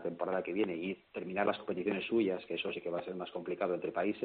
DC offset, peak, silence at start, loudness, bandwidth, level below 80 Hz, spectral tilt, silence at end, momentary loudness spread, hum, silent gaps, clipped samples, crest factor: under 0.1%; -18 dBFS; 0 s; -36 LUFS; 4.6 kHz; -74 dBFS; -4 dB/octave; 0 s; 8 LU; none; none; under 0.1%; 18 dB